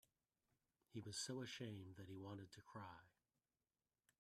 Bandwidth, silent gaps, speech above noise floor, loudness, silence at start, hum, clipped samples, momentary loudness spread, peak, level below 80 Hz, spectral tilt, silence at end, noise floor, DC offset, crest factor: 14.5 kHz; none; over 36 dB; -54 LUFS; 0.9 s; none; under 0.1%; 10 LU; -36 dBFS; -88 dBFS; -4 dB/octave; 1.1 s; under -90 dBFS; under 0.1%; 22 dB